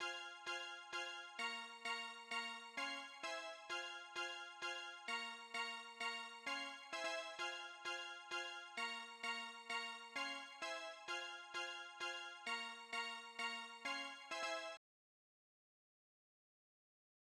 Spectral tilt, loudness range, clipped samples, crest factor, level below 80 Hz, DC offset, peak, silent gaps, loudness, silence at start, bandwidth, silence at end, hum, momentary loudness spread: 0.5 dB/octave; 2 LU; under 0.1%; 18 dB; under -90 dBFS; under 0.1%; -32 dBFS; none; -47 LUFS; 0 s; 15 kHz; 2.6 s; none; 3 LU